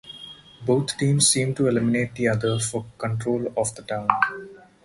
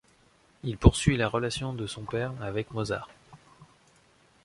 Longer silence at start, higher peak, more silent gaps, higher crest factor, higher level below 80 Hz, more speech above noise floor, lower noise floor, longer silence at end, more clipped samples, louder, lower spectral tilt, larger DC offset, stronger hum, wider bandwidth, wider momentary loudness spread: second, 0.05 s vs 0.65 s; about the same, 0 dBFS vs -2 dBFS; neither; about the same, 24 dB vs 28 dB; second, -56 dBFS vs -38 dBFS; second, 21 dB vs 35 dB; second, -43 dBFS vs -62 dBFS; second, 0.25 s vs 0.8 s; neither; first, -23 LUFS vs -28 LUFS; second, -4 dB/octave vs -5.5 dB/octave; neither; neither; about the same, 11.5 kHz vs 11.5 kHz; about the same, 13 LU vs 14 LU